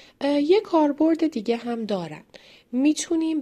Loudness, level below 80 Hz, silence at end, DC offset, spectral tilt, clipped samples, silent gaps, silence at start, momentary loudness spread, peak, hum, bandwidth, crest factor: -23 LUFS; -66 dBFS; 0 s; under 0.1%; -4.5 dB/octave; under 0.1%; none; 0.2 s; 10 LU; -8 dBFS; none; 11 kHz; 14 dB